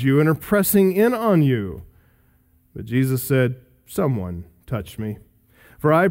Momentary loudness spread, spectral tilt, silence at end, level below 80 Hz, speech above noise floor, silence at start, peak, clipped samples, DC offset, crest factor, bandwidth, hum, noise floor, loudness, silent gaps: 19 LU; -6.5 dB/octave; 0 s; -50 dBFS; 39 dB; 0 s; -4 dBFS; under 0.1%; under 0.1%; 16 dB; 16.5 kHz; none; -59 dBFS; -20 LUFS; none